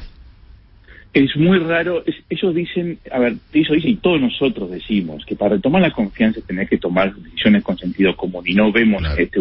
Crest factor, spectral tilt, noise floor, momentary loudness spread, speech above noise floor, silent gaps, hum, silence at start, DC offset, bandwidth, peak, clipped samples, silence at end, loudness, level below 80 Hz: 16 dB; -11.5 dB/octave; -44 dBFS; 8 LU; 28 dB; none; none; 0 s; under 0.1%; 5.6 kHz; -2 dBFS; under 0.1%; 0 s; -18 LUFS; -38 dBFS